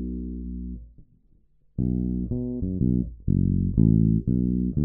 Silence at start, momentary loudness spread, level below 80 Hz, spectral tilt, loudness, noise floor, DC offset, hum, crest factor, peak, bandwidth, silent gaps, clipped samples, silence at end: 0 s; 15 LU; -34 dBFS; -16 dB/octave; -25 LUFS; -59 dBFS; under 0.1%; none; 18 dB; -8 dBFS; 1 kHz; none; under 0.1%; 0 s